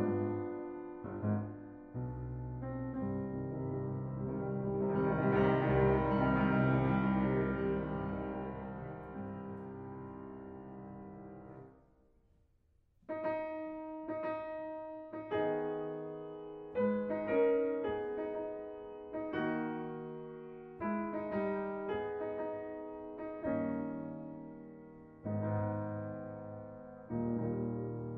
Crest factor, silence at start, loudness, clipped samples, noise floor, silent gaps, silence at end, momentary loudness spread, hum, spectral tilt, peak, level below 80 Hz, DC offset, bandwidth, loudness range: 20 dB; 0 s; -37 LUFS; under 0.1%; -72 dBFS; none; 0 s; 17 LU; none; -11 dB/octave; -18 dBFS; -56 dBFS; under 0.1%; 4.8 kHz; 13 LU